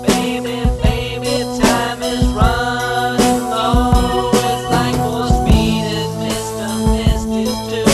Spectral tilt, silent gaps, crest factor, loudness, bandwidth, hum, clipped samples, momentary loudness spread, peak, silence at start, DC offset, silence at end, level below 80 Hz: -5 dB/octave; none; 16 dB; -16 LUFS; 14.5 kHz; none; under 0.1%; 6 LU; 0 dBFS; 0 s; under 0.1%; 0 s; -22 dBFS